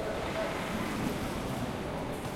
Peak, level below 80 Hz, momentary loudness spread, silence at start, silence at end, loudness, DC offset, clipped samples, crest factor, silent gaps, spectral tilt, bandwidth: -20 dBFS; -48 dBFS; 3 LU; 0 s; 0 s; -34 LUFS; under 0.1%; under 0.1%; 14 dB; none; -5.5 dB/octave; 16.5 kHz